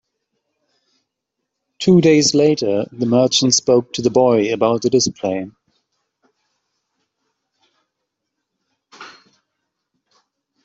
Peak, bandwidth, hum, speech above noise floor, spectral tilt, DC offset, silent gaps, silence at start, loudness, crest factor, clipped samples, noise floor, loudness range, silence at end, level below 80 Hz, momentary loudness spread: -2 dBFS; 8.2 kHz; none; 63 dB; -4.5 dB/octave; under 0.1%; none; 1.8 s; -15 LUFS; 18 dB; under 0.1%; -78 dBFS; 10 LU; 1.55 s; -60 dBFS; 9 LU